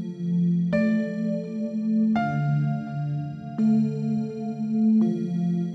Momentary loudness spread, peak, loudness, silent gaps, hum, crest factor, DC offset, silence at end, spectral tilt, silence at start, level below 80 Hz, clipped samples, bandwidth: 8 LU; -12 dBFS; -25 LUFS; none; none; 12 dB; under 0.1%; 0 s; -9.5 dB/octave; 0 s; -64 dBFS; under 0.1%; 6 kHz